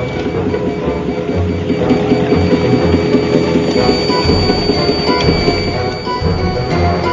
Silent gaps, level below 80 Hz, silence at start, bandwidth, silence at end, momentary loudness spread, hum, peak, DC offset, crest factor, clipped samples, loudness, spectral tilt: none; -26 dBFS; 0 s; 7.6 kHz; 0 s; 5 LU; none; 0 dBFS; under 0.1%; 14 dB; under 0.1%; -14 LUFS; -6.5 dB/octave